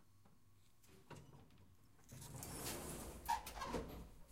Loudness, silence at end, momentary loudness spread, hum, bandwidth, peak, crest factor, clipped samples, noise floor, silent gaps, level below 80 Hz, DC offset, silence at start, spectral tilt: -48 LUFS; 0 s; 24 LU; none; 16 kHz; -28 dBFS; 22 dB; under 0.1%; -72 dBFS; none; -62 dBFS; under 0.1%; 0 s; -3.5 dB/octave